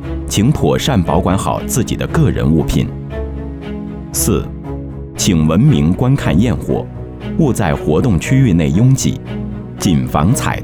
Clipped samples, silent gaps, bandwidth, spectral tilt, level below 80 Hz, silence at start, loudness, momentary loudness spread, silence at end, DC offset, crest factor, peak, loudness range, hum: under 0.1%; none; 19.5 kHz; -6 dB/octave; -26 dBFS; 0 s; -14 LUFS; 13 LU; 0 s; under 0.1%; 14 dB; 0 dBFS; 3 LU; none